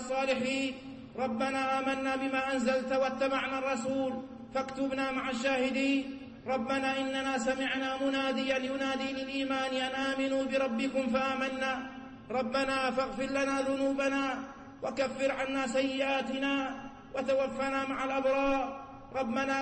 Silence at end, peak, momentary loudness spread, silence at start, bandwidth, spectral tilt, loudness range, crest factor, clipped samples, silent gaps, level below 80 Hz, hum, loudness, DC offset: 0 s; -20 dBFS; 7 LU; 0 s; 8.8 kHz; -4 dB/octave; 1 LU; 12 dB; under 0.1%; none; -60 dBFS; none; -32 LUFS; under 0.1%